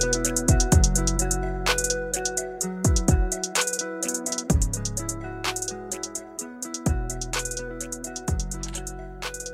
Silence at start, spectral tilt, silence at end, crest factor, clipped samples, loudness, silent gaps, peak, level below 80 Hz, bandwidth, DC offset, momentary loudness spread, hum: 0 s; -3.5 dB/octave; 0 s; 20 dB; under 0.1%; -26 LUFS; none; -6 dBFS; -30 dBFS; 16 kHz; under 0.1%; 11 LU; none